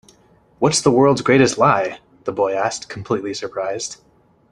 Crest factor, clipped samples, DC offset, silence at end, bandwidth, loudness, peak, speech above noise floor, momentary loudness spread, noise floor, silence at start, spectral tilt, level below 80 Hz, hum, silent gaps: 18 dB; under 0.1%; under 0.1%; 0.55 s; 12 kHz; -18 LUFS; 0 dBFS; 36 dB; 13 LU; -54 dBFS; 0.6 s; -4.5 dB/octave; -54 dBFS; none; none